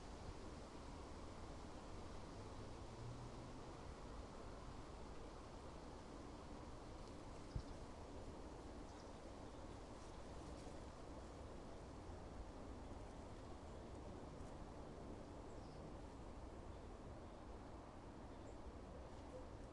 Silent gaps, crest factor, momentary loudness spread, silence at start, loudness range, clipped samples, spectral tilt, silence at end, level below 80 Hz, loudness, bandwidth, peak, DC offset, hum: none; 20 dB; 2 LU; 0 s; 1 LU; under 0.1%; -6 dB/octave; 0 s; -60 dBFS; -56 LUFS; 11 kHz; -34 dBFS; under 0.1%; none